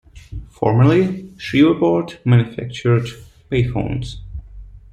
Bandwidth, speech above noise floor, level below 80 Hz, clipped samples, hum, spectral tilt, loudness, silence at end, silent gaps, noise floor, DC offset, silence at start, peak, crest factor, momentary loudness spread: 8.8 kHz; 21 dB; -38 dBFS; under 0.1%; none; -8 dB/octave; -17 LUFS; 0.15 s; none; -38 dBFS; under 0.1%; 0.15 s; -2 dBFS; 16 dB; 21 LU